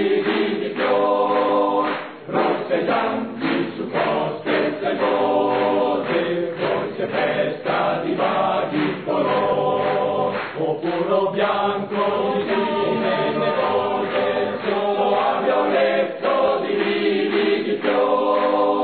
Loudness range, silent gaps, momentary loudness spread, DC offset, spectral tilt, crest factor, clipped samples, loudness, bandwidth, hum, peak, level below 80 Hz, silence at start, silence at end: 2 LU; none; 4 LU; 0.2%; -9 dB/octave; 14 dB; under 0.1%; -20 LUFS; 4.5 kHz; none; -6 dBFS; -68 dBFS; 0 s; 0 s